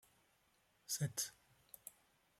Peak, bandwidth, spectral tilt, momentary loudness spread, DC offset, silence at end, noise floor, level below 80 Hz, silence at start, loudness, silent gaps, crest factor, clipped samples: -26 dBFS; 16 kHz; -3 dB/octave; 20 LU; under 0.1%; 0.5 s; -77 dBFS; -80 dBFS; 0.9 s; -43 LUFS; none; 22 dB; under 0.1%